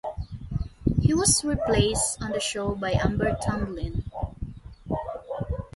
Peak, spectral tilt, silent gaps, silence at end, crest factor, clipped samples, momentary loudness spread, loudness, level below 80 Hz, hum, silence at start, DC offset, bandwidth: -6 dBFS; -4.5 dB/octave; none; 0.1 s; 20 dB; under 0.1%; 14 LU; -26 LUFS; -36 dBFS; none; 0.05 s; under 0.1%; 12 kHz